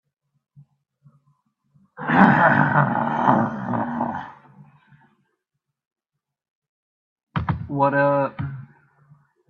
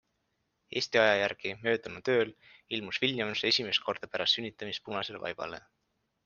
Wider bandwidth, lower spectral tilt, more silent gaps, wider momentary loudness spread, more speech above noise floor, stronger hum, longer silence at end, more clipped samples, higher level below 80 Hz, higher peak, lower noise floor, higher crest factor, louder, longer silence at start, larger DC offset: about the same, 6.6 kHz vs 7.2 kHz; first, -9 dB/octave vs -3.5 dB/octave; first, 5.87-5.91 s, 6.50-6.62 s, 6.69-7.16 s, 7.23-7.27 s vs none; first, 17 LU vs 12 LU; first, 64 dB vs 47 dB; neither; first, 0.85 s vs 0.65 s; neither; first, -54 dBFS vs -72 dBFS; first, 0 dBFS vs -8 dBFS; about the same, -81 dBFS vs -79 dBFS; about the same, 24 dB vs 24 dB; first, -20 LUFS vs -30 LUFS; first, 2 s vs 0.7 s; neither